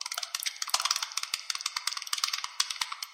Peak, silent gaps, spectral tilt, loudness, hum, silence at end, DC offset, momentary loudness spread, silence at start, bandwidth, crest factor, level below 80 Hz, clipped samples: -6 dBFS; none; 4 dB/octave; -31 LUFS; none; 0 s; under 0.1%; 5 LU; 0 s; 16.5 kHz; 28 dB; -74 dBFS; under 0.1%